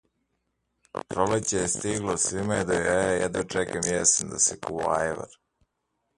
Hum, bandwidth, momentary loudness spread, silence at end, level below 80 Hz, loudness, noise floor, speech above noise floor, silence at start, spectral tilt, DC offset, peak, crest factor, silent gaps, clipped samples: none; 11.5 kHz; 10 LU; 0.9 s; -52 dBFS; -25 LUFS; -78 dBFS; 52 dB; 0.95 s; -3 dB/octave; under 0.1%; -8 dBFS; 20 dB; none; under 0.1%